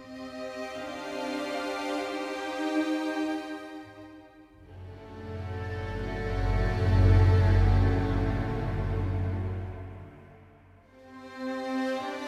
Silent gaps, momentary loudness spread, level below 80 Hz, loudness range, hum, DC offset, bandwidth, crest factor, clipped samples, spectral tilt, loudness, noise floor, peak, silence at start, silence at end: none; 22 LU; -36 dBFS; 10 LU; none; under 0.1%; 10 kHz; 18 dB; under 0.1%; -7.5 dB/octave; -29 LUFS; -55 dBFS; -10 dBFS; 0 s; 0 s